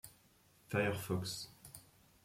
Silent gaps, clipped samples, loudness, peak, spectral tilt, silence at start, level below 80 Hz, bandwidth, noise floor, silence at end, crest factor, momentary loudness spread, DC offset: none; under 0.1%; -39 LUFS; -20 dBFS; -5 dB/octave; 0.05 s; -72 dBFS; 16.5 kHz; -69 dBFS; 0.4 s; 22 dB; 20 LU; under 0.1%